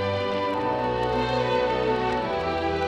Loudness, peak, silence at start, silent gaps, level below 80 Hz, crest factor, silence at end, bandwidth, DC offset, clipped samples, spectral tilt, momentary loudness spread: -25 LUFS; -12 dBFS; 0 s; none; -44 dBFS; 12 dB; 0 s; 9.6 kHz; under 0.1%; under 0.1%; -6.5 dB/octave; 2 LU